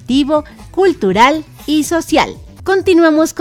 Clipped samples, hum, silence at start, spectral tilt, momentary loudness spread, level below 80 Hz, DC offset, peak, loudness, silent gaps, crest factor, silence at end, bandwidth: 0.1%; none; 0.1 s; -4.5 dB/octave; 10 LU; -40 dBFS; under 0.1%; 0 dBFS; -13 LUFS; none; 12 dB; 0 s; 16.5 kHz